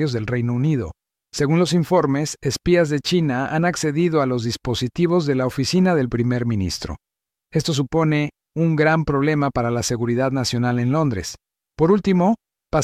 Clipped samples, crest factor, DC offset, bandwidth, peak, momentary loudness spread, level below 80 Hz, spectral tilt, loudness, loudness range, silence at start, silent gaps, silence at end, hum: under 0.1%; 16 dB; under 0.1%; 15 kHz; -4 dBFS; 7 LU; -46 dBFS; -6 dB/octave; -20 LUFS; 2 LU; 0 s; none; 0 s; none